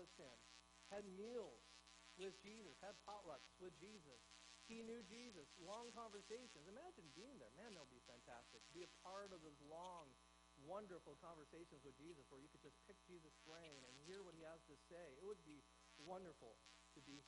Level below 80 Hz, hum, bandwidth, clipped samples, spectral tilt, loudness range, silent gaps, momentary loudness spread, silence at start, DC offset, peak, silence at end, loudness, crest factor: -80 dBFS; none; 10.5 kHz; under 0.1%; -3.5 dB/octave; 4 LU; none; 9 LU; 0 s; under 0.1%; -42 dBFS; 0 s; -60 LUFS; 20 dB